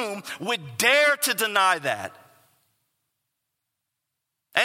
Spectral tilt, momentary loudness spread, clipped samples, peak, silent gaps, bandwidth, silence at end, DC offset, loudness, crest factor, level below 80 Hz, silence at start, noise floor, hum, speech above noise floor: -1.5 dB/octave; 14 LU; under 0.1%; -4 dBFS; none; 16.5 kHz; 0 s; under 0.1%; -22 LUFS; 22 dB; -80 dBFS; 0 s; -82 dBFS; none; 59 dB